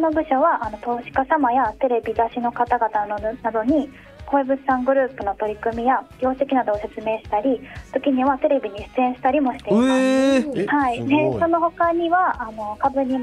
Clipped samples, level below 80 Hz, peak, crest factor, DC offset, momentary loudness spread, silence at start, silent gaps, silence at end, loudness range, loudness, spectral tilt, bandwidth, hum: under 0.1%; -48 dBFS; -4 dBFS; 16 dB; under 0.1%; 7 LU; 0 s; none; 0 s; 3 LU; -21 LUFS; -6 dB/octave; 11 kHz; none